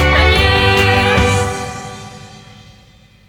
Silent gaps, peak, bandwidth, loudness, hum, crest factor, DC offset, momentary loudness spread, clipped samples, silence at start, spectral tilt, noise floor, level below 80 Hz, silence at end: none; 0 dBFS; 18.5 kHz; -12 LUFS; none; 14 dB; under 0.1%; 20 LU; under 0.1%; 0 s; -4.5 dB/octave; -45 dBFS; -24 dBFS; 0.9 s